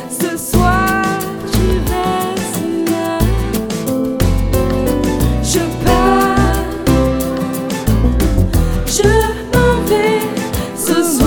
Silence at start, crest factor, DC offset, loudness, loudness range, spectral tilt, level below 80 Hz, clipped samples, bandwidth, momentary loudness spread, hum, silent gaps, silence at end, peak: 0 s; 14 dB; under 0.1%; -15 LUFS; 2 LU; -5.5 dB/octave; -20 dBFS; under 0.1%; over 20 kHz; 6 LU; none; none; 0 s; 0 dBFS